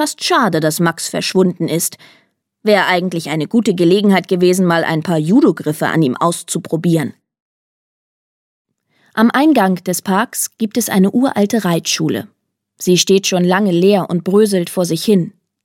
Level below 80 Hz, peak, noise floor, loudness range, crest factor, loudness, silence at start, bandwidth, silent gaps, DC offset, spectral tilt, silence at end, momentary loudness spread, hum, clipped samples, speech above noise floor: -64 dBFS; 0 dBFS; -58 dBFS; 4 LU; 14 dB; -14 LUFS; 0 s; 17 kHz; 7.40-8.65 s; under 0.1%; -5 dB/octave; 0.35 s; 7 LU; none; under 0.1%; 44 dB